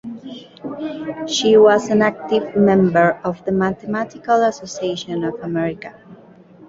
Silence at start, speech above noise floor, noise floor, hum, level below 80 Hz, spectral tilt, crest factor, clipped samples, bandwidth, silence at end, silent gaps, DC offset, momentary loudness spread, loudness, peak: 0.05 s; 27 dB; -44 dBFS; none; -56 dBFS; -5.5 dB/octave; 16 dB; under 0.1%; 7.8 kHz; 0.55 s; none; under 0.1%; 19 LU; -18 LUFS; -2 dBFS